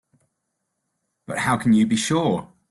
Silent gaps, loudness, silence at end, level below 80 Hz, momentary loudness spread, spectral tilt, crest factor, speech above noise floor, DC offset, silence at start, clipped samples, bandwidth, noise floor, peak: none; -21 LUFS; 0.25 s; -58 dBFS; 10 LU; -5 dB/octave; 14 dB; 57 dB; under 0.1%; 1.3 s; under 0.1%; 12 kHz; -77 dBFS; -8 dBFS